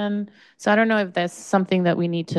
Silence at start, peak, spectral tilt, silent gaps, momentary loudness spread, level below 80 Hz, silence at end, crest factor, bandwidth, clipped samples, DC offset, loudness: 0 s; -6 dBFS; -6 dB/octave; none; 9 LU; -68 dBFS; 0 s; 16 dB; 12 kHz; under 0.1%; under 0.1%; -21 LUFS